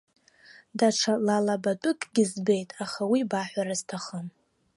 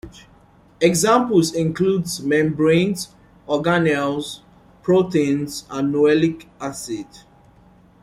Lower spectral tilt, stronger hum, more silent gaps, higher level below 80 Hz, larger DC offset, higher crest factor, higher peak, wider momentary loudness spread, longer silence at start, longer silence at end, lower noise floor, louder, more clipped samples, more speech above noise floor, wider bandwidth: about the same, -4.5 dB/octave vs -5.5 dB/octave; neither; neither; second, -76 dBFS vs -54 dBFS; neither; about the same, 18 dB vs 18 dB; second, -10 dBFS vs -2 dBFS; about the same, 12 LU vs 14 LU; first, 0.75 s vs 0.05 s; second, 0.45 s vs 0.85 s; first, -55 dBFS vs -51 dBFS; second, -27 LUFS vs -19 LUFS; neither; second, 28 dB vs 32 dB; second, 11.5 kHz vs 16 kHz